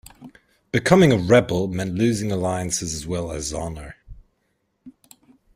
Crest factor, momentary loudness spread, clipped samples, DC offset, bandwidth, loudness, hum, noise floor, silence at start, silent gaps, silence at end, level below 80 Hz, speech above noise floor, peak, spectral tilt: 20 dB; 14 LU; under 0.1%; under 0.1%; 16 kHz; -21 LUFS; none; -71 dBFS; 0.2 s; none; 0.65 s; -46 dBFS; 51 dB; -2 dBFS; -5.5 dB/octave